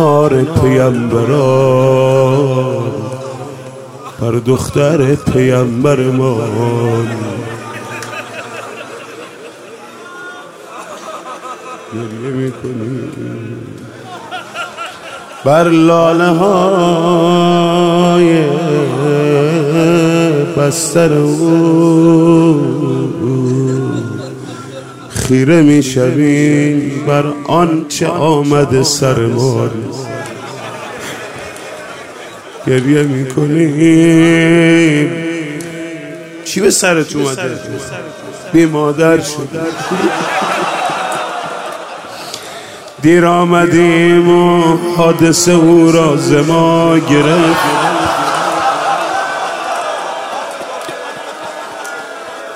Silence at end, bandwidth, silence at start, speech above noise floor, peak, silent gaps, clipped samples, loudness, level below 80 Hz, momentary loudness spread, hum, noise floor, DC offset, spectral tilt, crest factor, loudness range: 0 s; 16 kHz; 0 s; 22 dB; 0 dBFS; none; under 0.1%; -11 LUFS; -46 dBFS; 18 LU; none; -32 dBFS; under 0.1%; -5.5 dB/octave; 12 dB; 14 LU